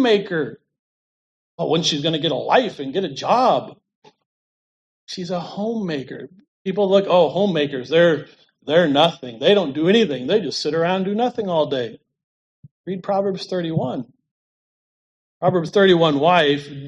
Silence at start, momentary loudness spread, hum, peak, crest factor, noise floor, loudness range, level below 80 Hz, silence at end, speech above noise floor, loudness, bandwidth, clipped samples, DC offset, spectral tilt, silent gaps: 0 s; 14 LU; none; -2 dBFS; 18 dB; under -90 dBFS; 8 LU; -66 dBFS; 0 s; over 71 dB; -19 LUFS; 10 kHz; under 0.1%; under 0.1%; -5.5 dB/octave; 0.79-1.58 s, 3.95-4.02 s, 4.26-5.07 s, 6.48-6.65 s, 12.24-12.63 s, 12.71-12.84 s, 14.31-15.41 s